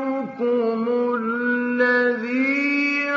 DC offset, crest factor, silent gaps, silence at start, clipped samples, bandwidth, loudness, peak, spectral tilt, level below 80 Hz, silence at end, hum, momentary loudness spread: under 0.1%; 14 dB; none; 0 s; under 0.1%; 7.2 kHz; -21 LUFS; -8 dBFS; -5.5 dB/octave; -74 dBFS; 0 s; none; 5 LU